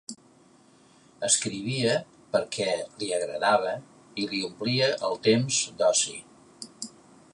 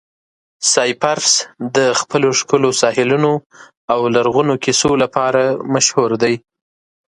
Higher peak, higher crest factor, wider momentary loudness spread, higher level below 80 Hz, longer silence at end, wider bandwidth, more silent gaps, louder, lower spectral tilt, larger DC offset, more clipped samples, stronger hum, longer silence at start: second, -8 dBFS vs 0 dBFS; about the same, 20 dB vs 16 dB; first, 16 LU vs 5 LU; second, -70 dBFS vs -54 dBFS; second, 0.45 s vs 0.8 s; about the same, 11.5 kHz vs 11.5 kHz; second, none vs 3.46-3.50 s, 3.77-3.88 s; second, -26 LUFS vs -15 LUFS; about the same, -3 dB/octave vs -3 dB/octave; neither; neither; neither; second, 0.1 s vs 0.6 s